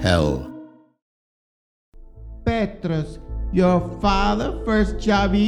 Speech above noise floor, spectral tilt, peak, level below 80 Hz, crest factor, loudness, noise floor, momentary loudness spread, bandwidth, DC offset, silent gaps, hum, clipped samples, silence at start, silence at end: 23 dB; -6.5 dB/octave; -2 dBFS; -32 dBFS; 20 dB; -22 LUFS; -42 dBFS; 14 LU; 11.5 kHz; under 0.1%; 1.02-1.92 s; none; under 0.1%; 0 s; 0 s